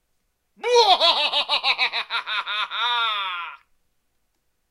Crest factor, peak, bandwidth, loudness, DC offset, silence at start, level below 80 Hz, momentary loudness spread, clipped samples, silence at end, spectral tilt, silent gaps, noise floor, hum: 20 dB; -2 dBFS; 14 kHz; -20 LUFS; under 0.1%; 0.65 s; -70 dBFS; 12 LU; under 0.1%; 1.15 s; 1.5 dB/octave; none; -71 dBFS; none